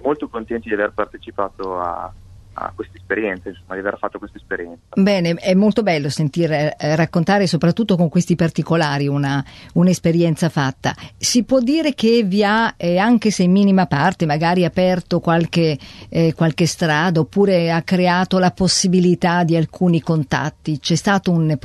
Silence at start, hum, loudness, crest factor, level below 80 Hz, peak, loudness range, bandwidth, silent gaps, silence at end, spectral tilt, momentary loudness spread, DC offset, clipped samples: 0 s; none; -17 LUFS; 16 dB; -46 dBFS; -2 dBFS; 8 LU; 12.5 kHz; none; 0.05 s; -5.5 dB/octave; 11 LU; under 0.1%; under 0.1%